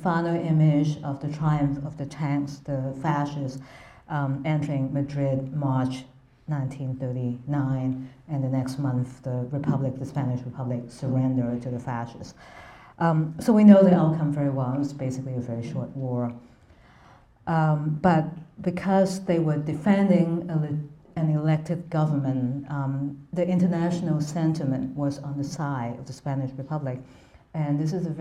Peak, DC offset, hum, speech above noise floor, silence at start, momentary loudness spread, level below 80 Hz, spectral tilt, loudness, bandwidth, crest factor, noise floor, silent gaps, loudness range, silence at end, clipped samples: -4 dBFS; under 0.1%; none; 29 dB; 0 s; 11 LU; -56 dBFS; -8.5 dB/octave; -26 LUFS; 11 kHz; 22 dB; -54 dBFS; none; 8 LU; 0 s; under 0.1%